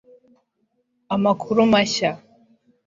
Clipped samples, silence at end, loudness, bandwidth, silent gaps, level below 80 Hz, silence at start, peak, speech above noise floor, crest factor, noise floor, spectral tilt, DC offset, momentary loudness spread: under 0.1%; 0.7 s; -20 LUFS; 7.6 kHz; none; -60 dBFS; 1.1 s; -2 dBFS; 52 dB; 20 dB; -71 dBFS; -4.5 dB/octave; under 0.1%; 10 LU